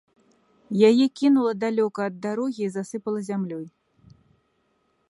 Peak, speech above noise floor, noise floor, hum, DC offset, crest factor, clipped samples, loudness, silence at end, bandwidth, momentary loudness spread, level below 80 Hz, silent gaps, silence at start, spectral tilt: -6 dBFS; 46 dB; -69 dBFS; none; under 0.1%; 20 dB; under 0.1%; -23 LUFS; 1.4 s; 11.5 kHz; 13 LU; -72 dBFS; none; 0.7 s; -6.5 dB/octave